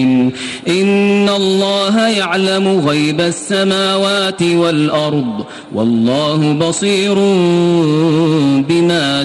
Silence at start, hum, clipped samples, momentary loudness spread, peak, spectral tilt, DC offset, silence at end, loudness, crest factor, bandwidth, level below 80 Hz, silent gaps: 0 s; none; under 0.1%; 5 LU; -2 dBFS; -5 dB/octave; under 0.1%; 0 s; -13 LUFS; 10 dB; 11.5 kHz; -54 dBFS; none